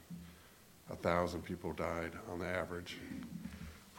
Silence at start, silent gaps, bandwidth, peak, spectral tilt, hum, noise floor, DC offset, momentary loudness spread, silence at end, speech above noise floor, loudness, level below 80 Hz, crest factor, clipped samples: 0 s; none; 16.5 kHz; -18 dBFS; -6 dB/octave; none; -61 dBFS; under 0.1%; 19 LU; 0 s; 22 dB; -41 LUFS; -60 dBFS; 24 dB; under 0.1%